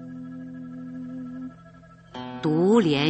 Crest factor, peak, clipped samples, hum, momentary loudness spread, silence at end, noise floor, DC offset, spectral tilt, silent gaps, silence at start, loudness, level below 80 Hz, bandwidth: 20 dB; -6 dBFS; under 0.1%; none; 19 LU; 0 s; -49 dBFS; under 0.1%; -7 dB/octave; none; 0 s; -25 LUFS; -62 dBFS; 8.4 kHz